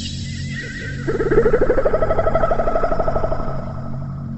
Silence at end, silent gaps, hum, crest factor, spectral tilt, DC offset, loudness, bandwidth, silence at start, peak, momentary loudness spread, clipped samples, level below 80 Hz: 0 s; none; none; 16 dB; -6.5 dB/octave; under 0.1%; -21 LUFS; 8.2 kHz; 0 s; -4 dBFS; 11 LU; under 0.1%; -26 dBFS